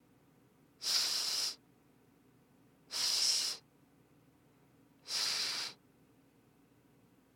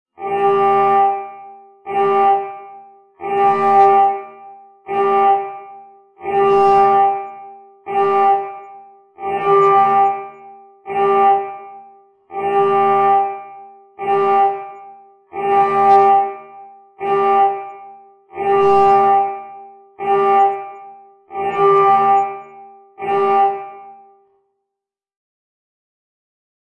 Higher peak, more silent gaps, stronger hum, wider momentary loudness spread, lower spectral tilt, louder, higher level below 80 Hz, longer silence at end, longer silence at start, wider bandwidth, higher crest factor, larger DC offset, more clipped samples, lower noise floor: second, -18 dBFS vs -2 dBFS; neither; neither; second, 14 LU vs 21 LU; second, 2 dB/octave vs -6.5 dB/octave; second, -33 LUFS vs -15 LUFS; second, -86 dBFS vs -60 dBFS; second, 1.6 s vs 2.7 s; first, 0.8 s vs 0.2 s; first, 18 kHz vs 5.8 kHz; first, 22 dB vs 16 dB; neither; neither; second, -67 dBFS vs -83 dBFS